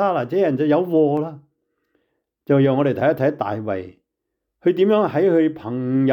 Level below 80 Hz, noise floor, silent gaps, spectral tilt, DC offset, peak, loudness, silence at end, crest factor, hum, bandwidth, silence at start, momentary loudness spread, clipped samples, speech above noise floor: -66 dBFS; -79 dBFS; none; -9.5 dB/octave; under 0.1%; -6 dBFS; -19 LUFS; 0 s; 12 dB; none; 14.5 kHz; 0 s; 9 LU; under 0.1%; 61 dB